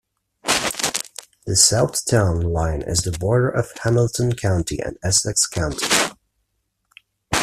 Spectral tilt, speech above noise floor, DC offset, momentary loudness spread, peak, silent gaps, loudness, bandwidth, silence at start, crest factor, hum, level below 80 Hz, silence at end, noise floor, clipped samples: -3.5 dB/octave; 53 dB; under 0.1%; 11 LU; 0 dBFS; none; -19 LUFS; 15.5 kHz; 0.45 s; 20 dB; none; -40 dBFS; 0 s; -72 dBFS; under 0.1%